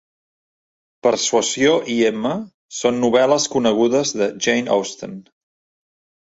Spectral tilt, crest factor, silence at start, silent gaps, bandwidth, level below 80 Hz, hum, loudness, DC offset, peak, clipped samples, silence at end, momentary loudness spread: -3 dB/octave; 18 dB; 1.05 s; 2.54-2.69 s; 8 kHz; -60 dBFS; none; -18 LUFS; under 0.1%; -2 dBFS; under 0.1%; 1.1 s; 13 LU